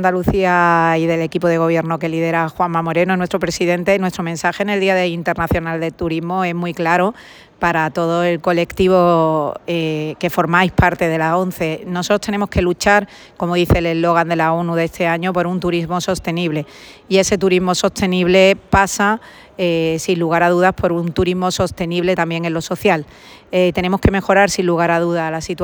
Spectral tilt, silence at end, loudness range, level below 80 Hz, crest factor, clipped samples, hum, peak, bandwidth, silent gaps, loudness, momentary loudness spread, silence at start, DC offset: -5.5 dB/octave; 0 s; 3 LU; -38 dBFS; 16 dB; under 0.1%; none; 0 dBFS; over 20 kHz; none; -16 LUFS; 7 LU; 0 s; under 0.1%